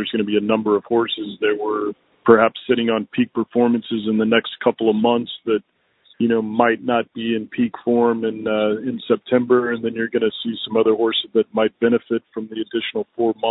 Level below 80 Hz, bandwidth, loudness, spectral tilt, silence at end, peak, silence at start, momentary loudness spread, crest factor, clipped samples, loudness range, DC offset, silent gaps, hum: -62 dBFS; 4.1 kHz; -20 LUFS; -10 dB/octave; 0 s; 0 dBFS; 0 s; 7 LU; 20 dB; under 0.1%; 2 LU; under 0.1%; none; none